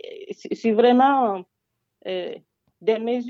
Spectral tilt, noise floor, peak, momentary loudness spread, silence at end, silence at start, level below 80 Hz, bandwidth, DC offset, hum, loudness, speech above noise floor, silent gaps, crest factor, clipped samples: -6 dB/octave; -78 dBFS; -6 dBFS; 21 LU; 0 s; 0.05 s; -76 dBFS; 7.4 kHz; under 0.1%; none; -21 LUFS; 58 dB; none; 16 dB; under 0.1%